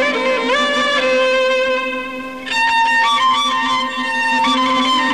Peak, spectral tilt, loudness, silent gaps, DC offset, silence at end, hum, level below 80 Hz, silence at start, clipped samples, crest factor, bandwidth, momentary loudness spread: -6 dBFS; -1.5 dB/octave; -15 LUFS; none; 0.5%; 0 s; none; -56 dBFS; 0 s; under 0.1%; 10 dB; 13.5 kHz; 7 LU